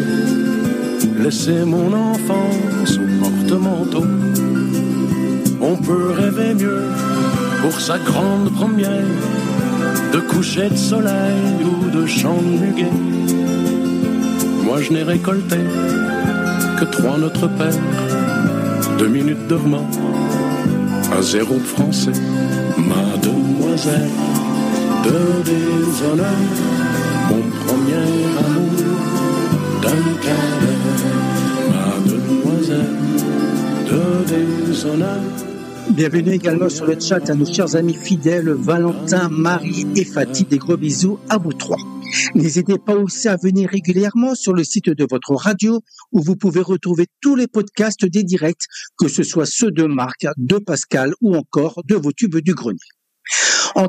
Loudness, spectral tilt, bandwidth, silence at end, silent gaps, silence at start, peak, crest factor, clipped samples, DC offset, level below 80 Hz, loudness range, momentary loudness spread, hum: -17 LUFS; -5.5 dB/octave; 15.5 kHz; 0 s; none; 0 s; 0 dBFS; 16 dB; under 0.1%; under 0.1%; -56 dBFS; 1 LU; 3 LU; none